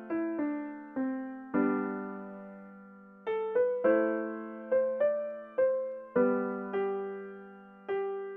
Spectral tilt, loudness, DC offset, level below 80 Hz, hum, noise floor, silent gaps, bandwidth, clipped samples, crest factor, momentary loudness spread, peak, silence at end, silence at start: -10 dB/octave; -32 LUFS; under 0.1%; -78 dBFS; none; -52 dBFS; none; 3.8 kHz; under 0.1%; 18 dB; 18 LU; -14 dBFS; 0 s; 0 s